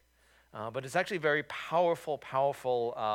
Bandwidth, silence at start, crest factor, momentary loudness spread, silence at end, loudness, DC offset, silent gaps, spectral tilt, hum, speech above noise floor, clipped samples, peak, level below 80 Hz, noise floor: 16.5 kHz; 0.55 s; 18 dB; 10 LU; 0 s; -32 LUFS; under 0.1%; none; -5 dB/octave; none; 34 dB; under 0.1%; -14 dBFS; -72 dBFS; -66 dBFS